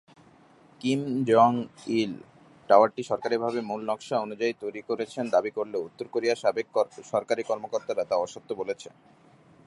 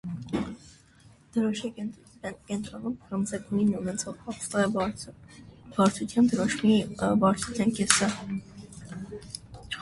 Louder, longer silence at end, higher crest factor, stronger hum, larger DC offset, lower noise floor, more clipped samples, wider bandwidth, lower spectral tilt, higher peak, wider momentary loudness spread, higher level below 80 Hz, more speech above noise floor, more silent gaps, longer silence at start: about the same, -27 LUFS vs -28 LUFS; first, 0.8 s vs 0 s; second, 22 dB vs 28 dB; neither; neither; about the same, -56 dBFS vs -56 dBFS; neither; about the same, 11.5 kHz vs 11.5 kHz; about the same, -5.5 dB/octave vs -4.5 dB/octave; about the same, -4 dBFS vs -2 dBFS; second, 13 LU vs 17 LU; second, -74 dBFS vs -56 dBFS; about the same, 30 dB vs 29 dB; neither; first, 0.85 s vs 0.05 s